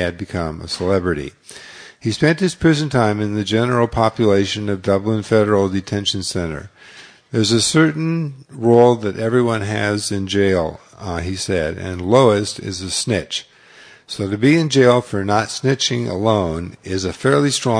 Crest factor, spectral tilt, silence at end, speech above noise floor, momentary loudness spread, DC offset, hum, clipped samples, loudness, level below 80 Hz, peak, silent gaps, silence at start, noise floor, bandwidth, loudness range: 18 dB; -5 dB/octave; 0 s; 28 dB; 12 LU; under 0.1%; none; under 0.1%; -18 LUFS; -44 dBFS; 0 dBFS; none; 0 s; -45 dBFS; 10.5 kHz; 3 LU